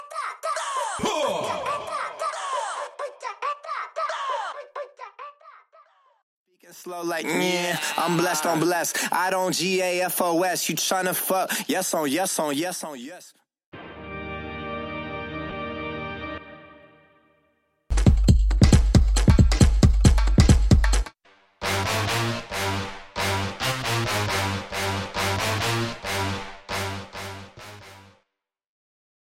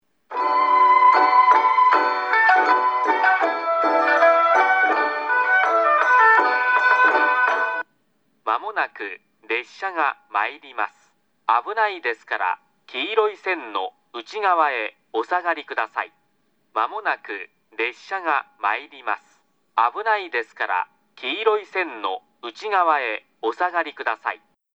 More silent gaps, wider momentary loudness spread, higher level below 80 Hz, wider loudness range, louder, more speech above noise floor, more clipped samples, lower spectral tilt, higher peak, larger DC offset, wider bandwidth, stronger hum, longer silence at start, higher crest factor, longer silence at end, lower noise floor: first, 6.23-6.46 s, 13.66-13.72 s vs none; first, 18 LU vs 15 LU; first, -28 dBFS vs -86 dBFS; first, 14 LU vs 10 LU; second, -24 LUFS vs -20 LUFS; first, 54 dB vs 44 dB; neither; first, -4.5 dB/octave vs -1.5 dB/octave; about the same, -2 dBFS vs -4 dBFS; neither; first, 16.5 kHz vs 7.6 kHz; neither; second, 0 s vs 0.3 s; about the same, 22 dB vs 18 dB; first, 1.25 s vs 0.4 s; first, -79 dBFS vs -68 dBFS